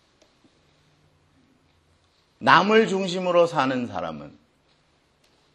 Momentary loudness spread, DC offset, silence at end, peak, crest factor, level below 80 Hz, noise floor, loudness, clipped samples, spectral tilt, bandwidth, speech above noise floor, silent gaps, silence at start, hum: 16 LU; under 0.1%; 1.25 s; 0 dBFS; 24 dB; -66 dBFS; -64 dBFS; -21 LUFS; under 0.1%; -5 dB/octave; 10.5 kHz; 43 dB; none; 2.4 s; none